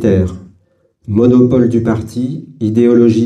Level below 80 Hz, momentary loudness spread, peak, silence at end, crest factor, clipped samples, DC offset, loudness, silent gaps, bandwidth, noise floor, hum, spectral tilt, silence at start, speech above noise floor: -40 dBFS; 12 LU; 0 dBFS; 0 s; 12 dB; under 0.1%; under 0.1%; -12 LUFS; none; 9.4 kHz; -55 dBFS; none; -9 dB/octave; 0 s; 44 dB